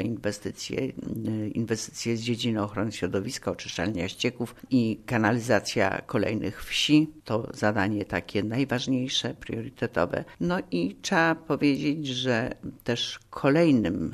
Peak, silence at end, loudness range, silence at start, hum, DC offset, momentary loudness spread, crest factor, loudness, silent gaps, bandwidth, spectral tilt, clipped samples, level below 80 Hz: -8 dBFS; 0 s; 4 LU; 0 s; none; under 0.1%; 9 LU; 20 dB; -27 LUFS; none; 13.5 kHz; -5 dB/octave; under 0.1%; -56 dBFS